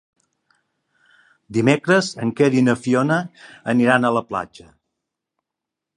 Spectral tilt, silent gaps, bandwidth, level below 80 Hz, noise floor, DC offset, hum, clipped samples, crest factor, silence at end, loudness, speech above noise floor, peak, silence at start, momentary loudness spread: -6 dB/octave; none; 11 kHz; -62 dBFS; -84 dBFS; under 0.1%; none; under 0.1%; 20 dB; 1.5 s; -19 LUFS; 66 dB; -2 dBFS; 1.5 s; 12 LU